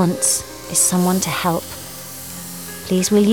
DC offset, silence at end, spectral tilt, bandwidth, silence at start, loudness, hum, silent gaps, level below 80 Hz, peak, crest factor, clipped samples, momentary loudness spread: 0.4%; 0 s; -4 dB/octave; over 20 kHz; 0 s; -17 LUFS; none; none; -50 dBFS; -4 dBFS; 14 dB; under 0.1%; 15 LU